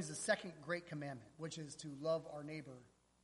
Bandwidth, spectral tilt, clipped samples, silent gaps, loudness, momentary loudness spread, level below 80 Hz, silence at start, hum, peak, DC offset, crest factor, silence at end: 11.5 kHz; -4 dB/octave; under 0.1%; none; -44 LUFS; 11 LU; -78 dBFS; 0 s; none; -22 dBFS; under 0.1%; 22 dB; 0.35 s